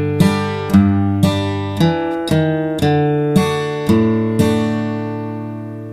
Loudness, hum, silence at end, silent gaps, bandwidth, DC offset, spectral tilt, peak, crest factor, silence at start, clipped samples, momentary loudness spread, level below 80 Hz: -16 LUFS; none; 0 s; none; 15.5 kHz; under 0.1%; -7 dB/octave; 0 dBFS; 16 dB; 0 s; under 0.1%; 9 LU; -42 dBFS